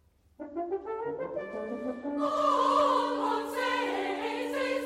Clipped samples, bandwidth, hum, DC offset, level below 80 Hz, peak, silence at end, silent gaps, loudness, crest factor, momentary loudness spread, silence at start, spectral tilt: under 0.1%; 16 kHz; none; under 0.1%; -68 dBFS; -16 dBFS; 0 s; none; -30 LUFS; 16 dB; 12 LU; 0.4 s; -3.5 dB/octave